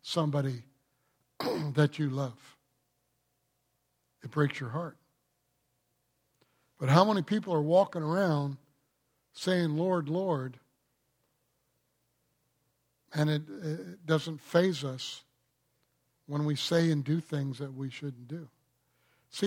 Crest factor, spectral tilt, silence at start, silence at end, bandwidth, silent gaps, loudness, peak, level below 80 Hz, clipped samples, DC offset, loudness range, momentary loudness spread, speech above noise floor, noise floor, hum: 26 dB; -6.5 dB/octave; 0.05 s; 0 s; 15.5 kHz; none; -31 LUFS; -6 dBFS; -78 dBFS; under 0.1%; under 0.1%; 10 LU; 14 LU; 48 dB; -78 dBFS; none